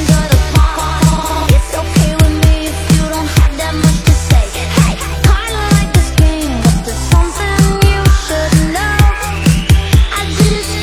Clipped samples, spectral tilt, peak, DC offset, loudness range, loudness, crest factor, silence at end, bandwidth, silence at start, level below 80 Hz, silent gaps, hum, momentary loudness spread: 0.2%; -5 dB/octave; 0 dBFS; under 0.1%; 1 LU; -12 LUFS; 10 dB; 0 s; 16 kHz; 0 s; -14 dBFS; none; none; 4 LU